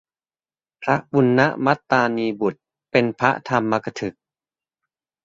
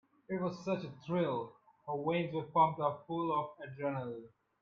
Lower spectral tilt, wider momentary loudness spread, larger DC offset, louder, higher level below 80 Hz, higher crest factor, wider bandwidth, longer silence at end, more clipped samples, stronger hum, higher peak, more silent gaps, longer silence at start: second, -6.5 dB/octave vs -8 dB/octave; second, 10 LU vs 14 LU; neither; first, -20 LUFS vs -36 LUFS; first, -60 dBFS vs -76 dBFS; about the same, 20 dB vs 20 dB; about the same, 7.6 kHz vs 7.2 kHz; first, 1.15 s vs 0.35 s; neither; neither; first, -2 dBFS vs -16 dBFS; neither; first, 0.8 s vs 0.3 s